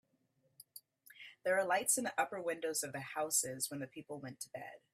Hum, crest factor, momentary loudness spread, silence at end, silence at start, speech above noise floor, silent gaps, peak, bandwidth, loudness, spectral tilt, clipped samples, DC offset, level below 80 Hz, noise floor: none; 22 dB; 22 LU; 0.15 s; 0.6 s; 39 dB; none; -16 dBFS; 16 kHz; -37 LUFS; -2 dB/octave; under 0.1%; under 0.1%; -84 dBFS; -78 dBFS